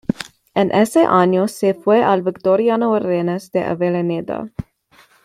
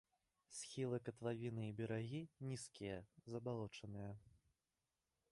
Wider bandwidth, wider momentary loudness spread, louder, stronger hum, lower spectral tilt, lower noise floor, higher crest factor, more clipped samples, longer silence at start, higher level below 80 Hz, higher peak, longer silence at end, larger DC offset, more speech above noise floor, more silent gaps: first, 15 kHz vs 11.5 kHz; first, 12 LU vs 8 LU; first, -17 LUFS vs -49 LUFS; neither; about the same, -6.5 dB/octave vs -6 dB/octave; second, -52 dBFS vs under -90 dBFS; about the same, 16 dB vs 18 dB; neither; second, 0.1 s vs 0.5 s; first, -52 dBFS vs -76 dBFS; first, -2 dBFS vs -32 dBFS; second, 0.65 s vs 0.95 s; neither; second, 36 dB vs over 42 dB; neither